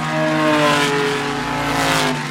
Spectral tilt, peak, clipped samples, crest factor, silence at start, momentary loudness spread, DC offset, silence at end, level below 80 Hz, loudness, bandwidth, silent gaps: -4 dB/octave; -2 dBFS; under 0.1%; 16 dB; 0 s; 6 LU; under 0.1%; 0 s; -44 dBFS; -17 LUFS; 16.5 kHz; none